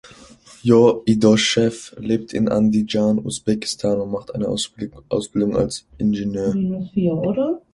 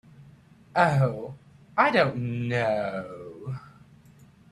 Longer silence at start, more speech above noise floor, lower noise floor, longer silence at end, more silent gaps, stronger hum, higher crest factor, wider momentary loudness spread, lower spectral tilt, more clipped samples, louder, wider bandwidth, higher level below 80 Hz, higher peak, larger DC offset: second, 0.05 s vs 0.2 s; about the same, 27 dB vs 30 dB; second, -46 dBFS vs -54 dBFS; second, 0.15 s vs 0.8 s; neither; neither; about the same, 18 dB vs 22 dB; second, 10 LU vs 18 LU; second, -5.5 dB/octave vs -7 dB/octave; neither; first, -20 LUFS vs -25 LUFS; about the same, 11.5 kHz vs 11.5 kHz; first, -48 dBFS vs -62 dBFS; first, -2 dBFS vs -6 dBFS; neither